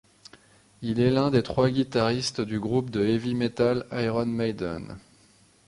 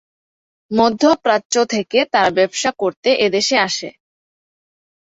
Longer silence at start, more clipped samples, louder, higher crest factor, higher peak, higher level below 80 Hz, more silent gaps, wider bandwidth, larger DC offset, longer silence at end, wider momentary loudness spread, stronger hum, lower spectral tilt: about the same, 0.8 s vs 0.7 s; neither; second, -26 LUFS vs -16 LUFS; about the same, 18 dB vs 18 dB; second, -8 dBFS vs 0 dBFS; first, -54 dBFS vs -60 dBFS; second, none vs 1.45-1.50 s, 2.97-3.03 s; first, 11.5 kHz vs 8 kHz; neither; second, 0.7 s vs 1.15 s; first, 10 LU vs 6 LU; neither; first, -6.5 dB/octave vs -3 dB/octave